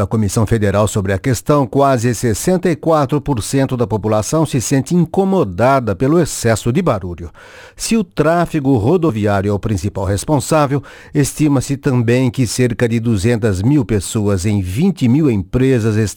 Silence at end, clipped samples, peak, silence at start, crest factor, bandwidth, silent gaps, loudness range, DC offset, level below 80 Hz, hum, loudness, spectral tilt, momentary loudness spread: 0 s; under 0.1%; -2 dBFS; 0 s; 14 dB; 19 kHz; none; 1 LU; under 0.1%; -38 dBFS; none; -15 LUFS; -6.5 dB/octave; 4 LU